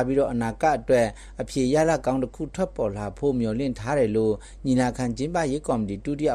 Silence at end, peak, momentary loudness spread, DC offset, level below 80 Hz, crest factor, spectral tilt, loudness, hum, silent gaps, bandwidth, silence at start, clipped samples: 0 s; -10 dBFS; 7 LU; under 0.1%; -44 dBFS; 14 dB; -6.5 dB/octave; -25 LUFS; none; none; 12.5 kHz; 0 s; under 0.1%